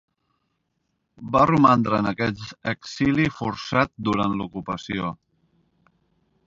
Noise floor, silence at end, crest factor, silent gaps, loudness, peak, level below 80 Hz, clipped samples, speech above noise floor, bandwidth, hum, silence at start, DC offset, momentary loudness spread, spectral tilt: -75 dBFS; 1.3 s; 22 dB; none; -23 LUFS; -2 dBFS; -52 dBFS; under 0.1%; 52 dB; 7.6 kHz; none; 1.2 s; under 0.1%; 13 LU; -6.5 dB/octave